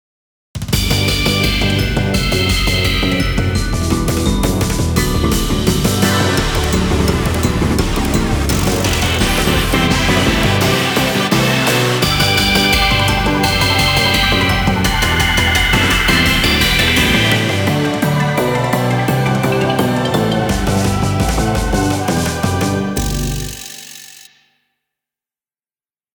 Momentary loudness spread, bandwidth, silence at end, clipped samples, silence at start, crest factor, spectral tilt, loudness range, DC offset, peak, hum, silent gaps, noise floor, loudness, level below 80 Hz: 6 LU; over 20 kHz; 2 s; under 0.1%; 0.55 s; 14 dB; -4.5 dB/octave; 5 LU; under 0.1%; 0 dBFS; 50 Hz at -40 dBFS; none; under -90 dBFS; -14 LUFS; -24 dBFS